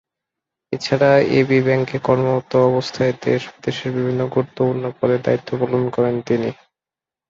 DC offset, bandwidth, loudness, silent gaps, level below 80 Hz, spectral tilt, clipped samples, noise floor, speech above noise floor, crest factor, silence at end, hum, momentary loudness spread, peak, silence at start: under 0.1%; 7.6 kHz; -19 LUFS; none; -56 dBFS; -7 dB/octave; under 0.1%; -89 dBFS; 71 dB; 16 dB; 0.75 s; none; 8 LU; -2 dBFS; 0.7 s